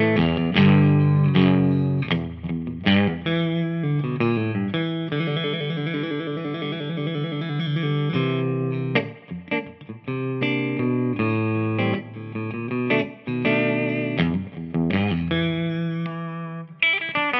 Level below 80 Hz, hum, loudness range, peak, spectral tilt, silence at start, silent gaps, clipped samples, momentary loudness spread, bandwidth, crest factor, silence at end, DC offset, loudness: -56 dBFS; none; 5 LU; -4 dBFS; -9.5 dB/octave; 0 s; none; under 0.1%; 11 LU; 5.8 kHz; 18 dB; 0 s; under 0.1%; -23 LUFS